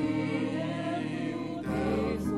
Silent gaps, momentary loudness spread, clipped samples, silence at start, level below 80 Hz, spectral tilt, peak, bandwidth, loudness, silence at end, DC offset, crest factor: none; 4 LU; under 0.1%; 0 s; -50 dBFS; -7 dB/octave; -18 dBFS; 12.5 kHz; -32 LUFS; 0 s; under 0.1%; 12 dB